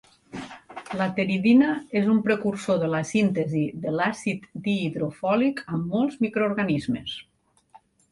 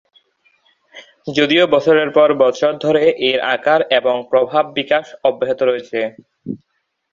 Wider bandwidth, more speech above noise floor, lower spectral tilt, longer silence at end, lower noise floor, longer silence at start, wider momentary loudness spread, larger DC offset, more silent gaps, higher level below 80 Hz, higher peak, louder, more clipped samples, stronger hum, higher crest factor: first, 11.5 kHz vs 7.4 kHz; second, 32 dB vs 44 dB; first, -6.5 dB/octave vs -5 dB/octave; second, 0.35 s vs 0.55 s; about the same, -56 dBFS vs -59 dBFS; second, 0.35 s vs 0.95 s; about the same, 15 LU vs 15 LU; neither; neither; about the same, -62 dBFS vs -62 dBFS; second, -8 dBFS vs 0 dBFS; second, -24 LUFS vs -15 LUFS; neither; neither; about the same, 16 dB vs 16 dB